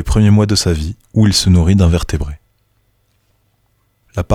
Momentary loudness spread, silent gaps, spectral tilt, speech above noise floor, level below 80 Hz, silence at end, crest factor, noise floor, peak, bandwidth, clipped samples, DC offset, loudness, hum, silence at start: 13 LU; none; -5.5 dB/octave; 48 dB; -28 dBFS; 0 s; 12 dB; -60 dBFS; -2 dBFS; 14.5 kHz; under 0.1%; under 0.1%; -13 LUFS; none; 0 s